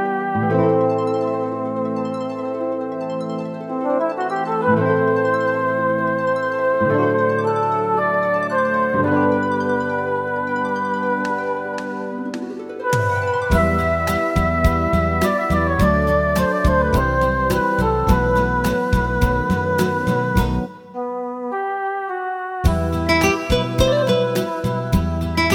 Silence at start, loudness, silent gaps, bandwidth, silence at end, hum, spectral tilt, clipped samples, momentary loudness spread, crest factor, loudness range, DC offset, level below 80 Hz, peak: 0 s; -19 LUFS; none; 17.5 kHz; 0 s; none; -6.5 dB/octave; under 0.1%; 8 LU; 18 dB; 5 LU; under 0.1%; -30 dBFS; -2 dBFS